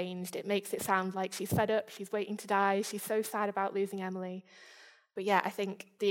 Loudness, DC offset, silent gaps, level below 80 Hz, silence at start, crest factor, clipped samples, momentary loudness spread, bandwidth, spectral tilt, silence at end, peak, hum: -33 LUFS; under 0.1%; none; -70 dBFS; 0 s; 22 dB; under 0.1%; 9 LU; 17 kHz; -4.5 dB/octave; 0 s; -12 dBFS; none